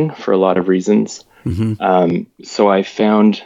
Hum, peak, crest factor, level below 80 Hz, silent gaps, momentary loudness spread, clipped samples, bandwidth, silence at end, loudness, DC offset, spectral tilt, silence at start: none; 0 dBFS; 14 dB; -48 dBFS; none; 11 LU; under 0.1%; 7.8 kHz; 0 s; -15 LUFS; under 0.1%; -7 dB/octave; 0 s